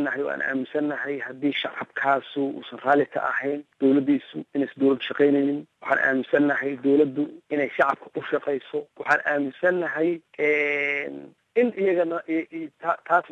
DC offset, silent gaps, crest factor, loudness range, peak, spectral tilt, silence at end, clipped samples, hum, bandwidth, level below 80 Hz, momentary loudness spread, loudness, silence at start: under 0.1%; none; 18 dB; 2 LU; -6 dBFS; -6.5 dB/octave; 0.05 s; under 0.1%; none; 7 kHz; -72 dBFS; 9 LU; -24 LUFS; 0 s